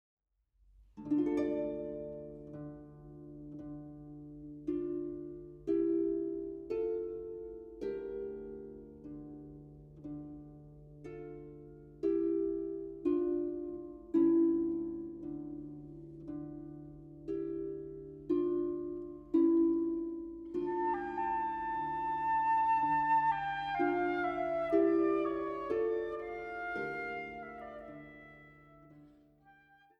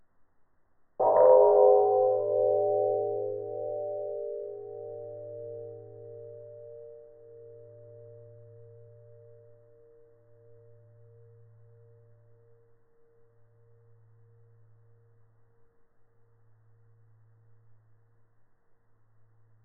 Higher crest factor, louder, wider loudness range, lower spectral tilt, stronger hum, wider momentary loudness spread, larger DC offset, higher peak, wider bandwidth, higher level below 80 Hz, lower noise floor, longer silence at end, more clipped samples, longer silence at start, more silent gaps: about the same, 20 dB vs 24 dB; second, -35 LUFS vs -25 LUFS; second, 12 LU vs 27 LU; first, -8.5 dB/octave vs -4 dB/octave; neither; second, 20 LU vs 31 LU; neither; second, -16 dBFS vs -8 dBFS; first, 5 kHz vs 2.1 kHz; first, -62 dBFS vs -76 dBFS; first, -73 dBFS vs -64 dBFS; second, 0.45 s vs 11.6 s; neither; second, 0.8 s vs 1 s; neither